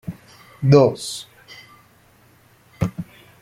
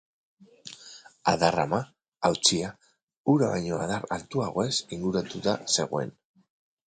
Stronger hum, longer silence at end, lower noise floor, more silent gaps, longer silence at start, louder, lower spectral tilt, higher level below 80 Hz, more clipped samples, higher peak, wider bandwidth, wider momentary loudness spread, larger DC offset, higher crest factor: neither; second, 0.4 s vs 0.75 s; first, -54 dBFS vs -50 dBFS; second, none vs 2.08-2.12 s, 3.03-3.08 s, 3.17-3.24 s; second, 0.1 s vs 0.65 s; first, -19 LUFS vs -27 LUFS; first, -7 dB/octave vs -4 dB/octave; first, -50 dBFS vs -58 dBFS; neither; first, -2 dBFS vs -6 dBFS; first, 14.5 kHz vs 9.6 kHz; first, 28 LU vs 20 LU; neither; about the same, 20 dB vs 22 dB